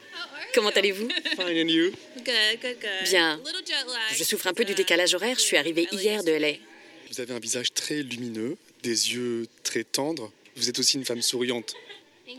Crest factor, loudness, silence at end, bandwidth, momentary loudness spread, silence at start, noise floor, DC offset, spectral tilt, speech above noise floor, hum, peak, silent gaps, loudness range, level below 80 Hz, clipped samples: 20 dB; -25 LUFS; 0 s; 17.5 kHz; 13 LU; 0 s; -46 dBFS; under 0.1%; -1.5 dB/octave; 20 dB; none; -6 dBFS; none; 5 LU; -88 dBFS; under 0.1%